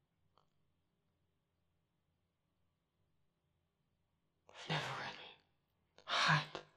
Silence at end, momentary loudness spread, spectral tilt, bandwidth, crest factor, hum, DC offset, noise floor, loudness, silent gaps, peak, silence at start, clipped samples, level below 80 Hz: 0.15 s; 23 LU; -3.5 dB/octave; 11.5 kHz; 26 dB; none; under 0.1%; -84 dBFS; -37 LUFS; none; -20 dBFS; 4.55 s; under 0.1%; -82 dBFS